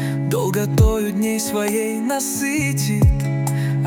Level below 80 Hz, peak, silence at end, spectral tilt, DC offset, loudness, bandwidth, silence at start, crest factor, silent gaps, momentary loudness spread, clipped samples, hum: -28 dBFS; -4 dBFS; 0 s; -5.5 dB/octave; under 0.1%; -19 LUFS; 18 kHz; 0 s; 14 dB; none; 4 LU; under 0.1%; none